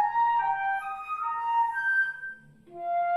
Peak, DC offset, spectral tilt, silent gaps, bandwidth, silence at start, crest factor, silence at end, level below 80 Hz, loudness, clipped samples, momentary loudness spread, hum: -16 dBFS; under 0.1%; -3.5 dB/octave; none; 12 kHz; 0 s; 12 dB; 0 s; -70 dBFS; -27 LUFS; under 0.1%; 14 LU; none